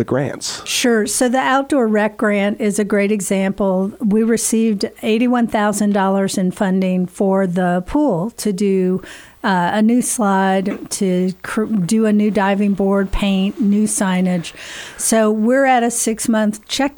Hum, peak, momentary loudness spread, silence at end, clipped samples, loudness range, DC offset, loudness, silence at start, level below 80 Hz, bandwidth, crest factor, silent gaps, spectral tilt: none; -4 dBFS; 5 LU; 0.05 s; under 0.1%; 1 LU; under 0.1%; -17 LUFS; 0 s; -40 dBFS; 19.5 kHz; 12 dB; none; -5 dB/octave